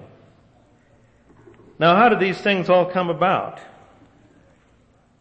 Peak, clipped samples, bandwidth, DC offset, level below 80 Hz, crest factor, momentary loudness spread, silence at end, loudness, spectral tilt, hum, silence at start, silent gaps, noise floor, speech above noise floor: -4 dBFS; under 0.1%; 8.4 kHz; under 0.1%; -60 dBFS; 18 dB; 10 LU; 1.6 s; -18 LUFS; -7 dB/octave; none; 1.8 s; none; -57 dBFS; 39 dB